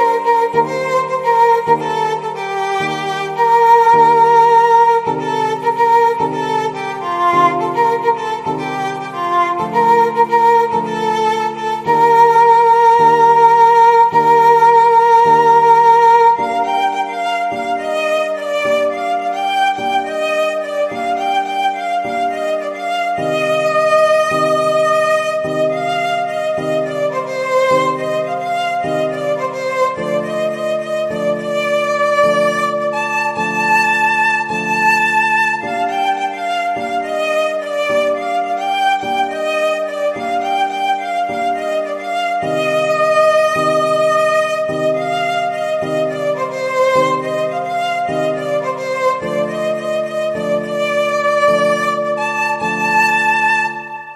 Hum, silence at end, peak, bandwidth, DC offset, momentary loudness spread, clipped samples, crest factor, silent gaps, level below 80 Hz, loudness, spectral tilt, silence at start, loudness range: none; 0 s; 0 dBFS; 14.5 kHz; under 0.1%; 10 LU; under 0.1%; 14 dB; none; -58 dBFS; -14 LUFS; -4 dB/octave; 0 s; 8 LU